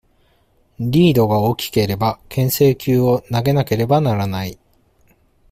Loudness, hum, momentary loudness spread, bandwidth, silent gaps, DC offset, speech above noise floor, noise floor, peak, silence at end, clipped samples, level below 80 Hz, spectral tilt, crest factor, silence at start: -17 LUFS; none; 8 LU; 16 kHz; none; under 0.1%; 42 dB; -58 dBFS; -2 dBFS; 0.95 s; under 0.1%; -46 dBFS; -6.5 dB/octave; 14 dB; 0.8 s